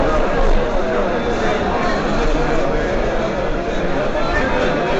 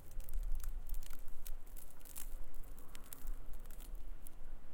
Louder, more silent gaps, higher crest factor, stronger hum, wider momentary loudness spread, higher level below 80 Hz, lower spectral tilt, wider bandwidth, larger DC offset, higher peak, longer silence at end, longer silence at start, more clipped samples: first, -19 LUFS vs -52 LUFS; neither; about the same, 12 dB vs 12 dB; neither; second, 3 LU vs 9 LU; first, -22 dBFS vs -42 dBFS; first, -6 dB/octave vs -4 dB/octave; second, 7.8 kHz vs 17 kHz; neither; first, -4 dBFS vs -24 dBFS; about the same, 0 s vs 0 s; about the same, 0 s vs 0 s; neither